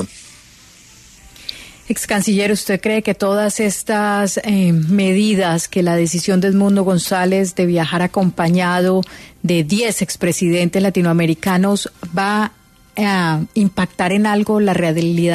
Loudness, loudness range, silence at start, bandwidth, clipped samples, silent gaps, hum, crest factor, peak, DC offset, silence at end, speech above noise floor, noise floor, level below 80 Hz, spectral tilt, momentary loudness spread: -16 LUFS; 3 LU; 0 s; 13.5 kHz; under 0.1%; none; none; 12 dB; -4 dBFS; under 0.1%; 0 s; 29 dB; -44 dBFS; -50 dBFS; -5.5 dB/octave; 6 LU